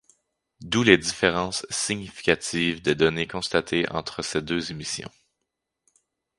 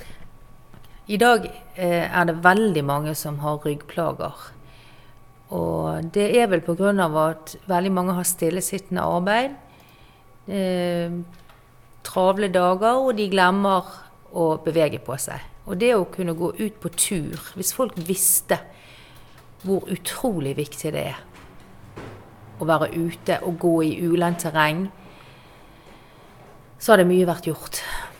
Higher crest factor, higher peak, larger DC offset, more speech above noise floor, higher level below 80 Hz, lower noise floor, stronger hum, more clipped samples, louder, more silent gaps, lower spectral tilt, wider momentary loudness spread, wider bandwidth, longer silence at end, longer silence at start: about the same, 26 dB vs 24 dB; about the same, 0 dBFS vs 0 dBFS; neither; first, 57 dB vs 28 dB; about the same, -52 dBFS vs -50 dBFS; first, -82 dBFS vs -50 dBFS; neither; neither; about the same, -24 LUFS vs -22 LUFS; neither; about the same, -3.5 dB/octave vs -4.5 dB/octave; second, 11 LU vs 14 LU; second, 11.5 kHz vs 19 kHz; first, 1.3 s vs 0 s; first, 0.6 s vs 0 s